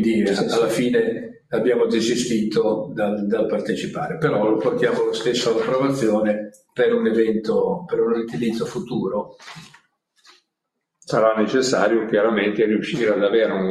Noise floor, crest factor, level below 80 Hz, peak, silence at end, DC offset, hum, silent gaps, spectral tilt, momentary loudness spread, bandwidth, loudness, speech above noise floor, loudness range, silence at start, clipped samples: -79 dBFS; 16 dB; -60 dBFS; -4 dBFS; 0 s; under 0.1%; none; none; -5.5 dB/octave; 7 LU; 13.5 kHz; -20 LUFS; 59 dB; 5 LU; 0 s; under 0.1%